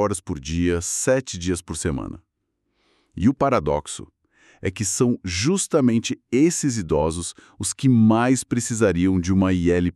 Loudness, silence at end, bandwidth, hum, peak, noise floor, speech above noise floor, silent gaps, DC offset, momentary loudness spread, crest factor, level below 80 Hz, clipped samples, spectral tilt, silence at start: -21 LUFS; 0.05 s; 13.5 kHz; none; -6 dBFS; -75 dBFS; 54 dB; none; under 0.1%; 10 LU; 16 dB; -42 dBFS; under 0.1%; -5 dB/octave; 0 s